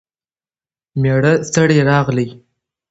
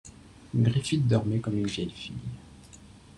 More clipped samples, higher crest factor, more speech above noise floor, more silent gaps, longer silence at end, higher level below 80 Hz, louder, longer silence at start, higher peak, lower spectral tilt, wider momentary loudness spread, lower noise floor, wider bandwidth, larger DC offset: neither; about the same, 16 dB vs 18 dB; first, over 76 dB vs 24 dB; neither; first, 0.6 s vs 0.2 s; first, -48 dBFS vs -54 dBFS; first, -14 LUFS vs -28 LUFS; first, 0.95 s vs 0.05 s; first, 0 dBFS vs -12 dBFS; about the same, -6 dB/octave vs -6.5 dB/octave; second, 10 LU vs 14 LU; first, under -90 dBFS vs -51 dBFS; second, 8.2 kHz vs 11 kHz; neither